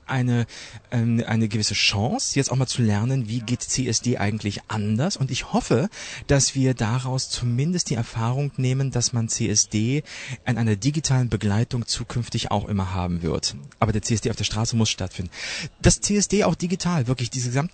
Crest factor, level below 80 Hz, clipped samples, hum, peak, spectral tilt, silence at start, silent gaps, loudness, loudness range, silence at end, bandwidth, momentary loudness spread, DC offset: 20 dB; -42 dBFS; under 0.1%; none; -2 dBFS; -4.5 dB/octave; 0.1 s; none; -23 LUFS; 2 LU; 0.05 s; 9.2 kHz; 8 LU; under 0.1%